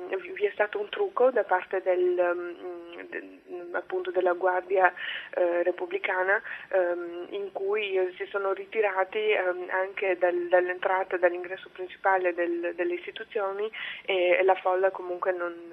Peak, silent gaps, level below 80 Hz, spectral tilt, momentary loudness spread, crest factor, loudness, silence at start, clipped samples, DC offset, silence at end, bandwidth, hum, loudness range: -6 dBFS; none; -78 dBFS; -6 dB/octave; 11 LU; 22 dB; -27 LUFS; 0 s; under 0.1%; under 0.1%; 0 s; 4.2 kHz; none; 2 LU